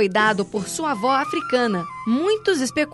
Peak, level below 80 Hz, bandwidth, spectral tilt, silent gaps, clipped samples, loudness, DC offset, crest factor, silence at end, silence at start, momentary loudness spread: -6 dBFS; -60 dBFS; 12 kHz; -4 dB/octave; none; under 0.1%; -21 LUFS; under 0.1%; 14 dB; 0 s; 0 s; 5 LU